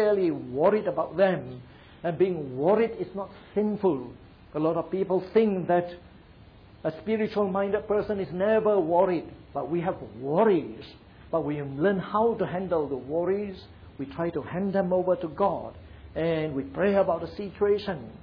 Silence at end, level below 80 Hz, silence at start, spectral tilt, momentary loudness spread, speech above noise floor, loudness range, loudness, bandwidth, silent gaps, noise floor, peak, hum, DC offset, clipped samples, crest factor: 0.05 s; -56 dBFS; 0 s; -10 dB/octave; 14 LU; 25 dB; 2 LU; -27 LUFS; 5.4 kHz; none; -51 dBFS; -10 dBFS; none; under 0.1%; under 0.1%; 16 dB